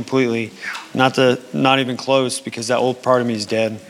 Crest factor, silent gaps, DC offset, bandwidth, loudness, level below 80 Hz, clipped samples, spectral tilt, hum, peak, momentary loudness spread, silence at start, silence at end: 18 dB; none; under 0.1%; 15 kHz; -18 LUFS; -70 dBFS; under 0.1%; -4.5 dB/octave; none; 0 dBFS; 8 LU; 0 s; 0 s